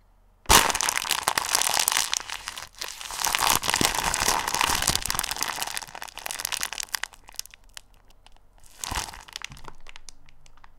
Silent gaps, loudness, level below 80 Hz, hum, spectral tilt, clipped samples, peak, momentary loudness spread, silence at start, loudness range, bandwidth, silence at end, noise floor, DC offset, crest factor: none; -24 LUFS; -44 dBFS; none; -0.5 dB/octave; under 0.1%; 0 dBFS; 17 LU; 0.45 s; 13 LU; 17 kHz; 0 s; -53 dBFS; under 0.1%; 28 dB